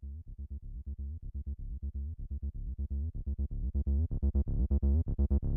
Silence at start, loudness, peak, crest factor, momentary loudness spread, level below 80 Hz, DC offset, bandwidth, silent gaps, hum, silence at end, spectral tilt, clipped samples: 0 s; -36 LUFS; -18 dBFS; 14 dB; 14 LU; -34 dBFS; under 0.1%; 1.2 kHz; none; none; 0 s; -16 dB/octave; under 0.1%